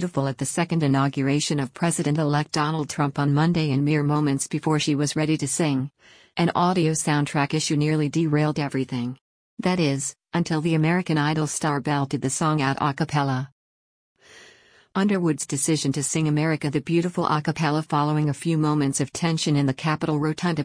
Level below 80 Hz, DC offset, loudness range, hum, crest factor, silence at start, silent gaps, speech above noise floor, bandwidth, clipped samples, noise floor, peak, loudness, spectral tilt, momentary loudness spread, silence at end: -60 dBFS; under 0.1%; 3 LU; none; 16 dB; 0 s; 9.21-9.57 s, 13.52-14.15 s; 31 dB; 10.5 kHz; under 0.1%; -54 dBFS; -8 dBFS; -23 LUFS; -5.5 dB/octave; 4 LU; 0 s